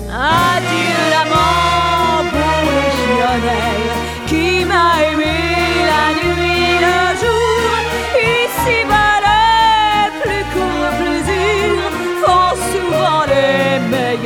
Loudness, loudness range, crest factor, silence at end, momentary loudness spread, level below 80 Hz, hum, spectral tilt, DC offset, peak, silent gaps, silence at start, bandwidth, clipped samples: -13 LUFS; 2 LU; 12 dB; 0 s; 5 LU; -30 dBFS; none; -4 dB/octave; under 0.1%; 0 dBFS; none; 0 s; 18.5 kHz; under 0.1%